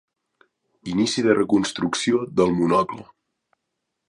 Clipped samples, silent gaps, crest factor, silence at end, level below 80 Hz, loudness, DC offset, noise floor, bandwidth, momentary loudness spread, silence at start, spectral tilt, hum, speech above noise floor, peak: under 0.1%; none; 20 dB; 1.05 s; -56 dBFS; -21 LUFS; under 0.1%; -79 dBFS; 11.5 kHz; 10 LU; 0.85 s; -5 dB/octave; none; 59 dB; -4 dBFS